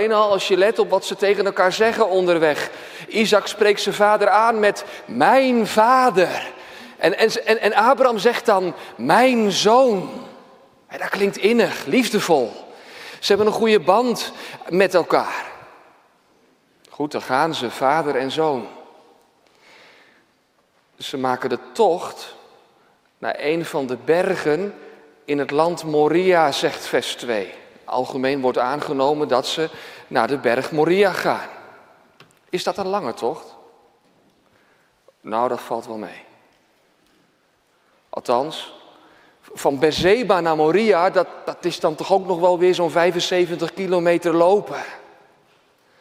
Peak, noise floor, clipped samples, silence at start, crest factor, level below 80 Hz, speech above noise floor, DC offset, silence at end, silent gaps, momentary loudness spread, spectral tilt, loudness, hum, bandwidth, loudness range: 0 dBFS; -62 dBFS; under 0.1%; 0 s; 20 dB; -62 dBFS; 43 dB; under 0.1%; 1 s; none; 15 LU; -4.5 dB/octave; -19 LUFS; none; 16 kHz; 12 LU